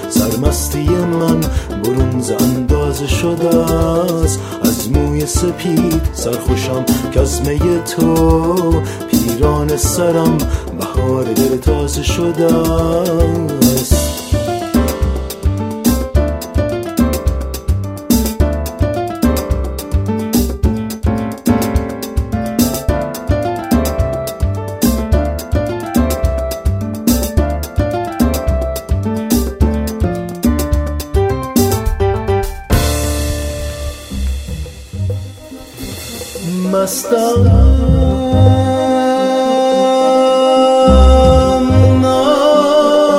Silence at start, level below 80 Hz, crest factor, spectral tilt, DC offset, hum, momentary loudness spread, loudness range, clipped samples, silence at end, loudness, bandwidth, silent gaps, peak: 0 s; -20 dBFS; 14 dB; -6 dB/octave; under 0.1%; none; 9 LU; 6 LU; under 0.1%; 0 s; -14 LUFS; 16.5 kHz; none; 0 dBFS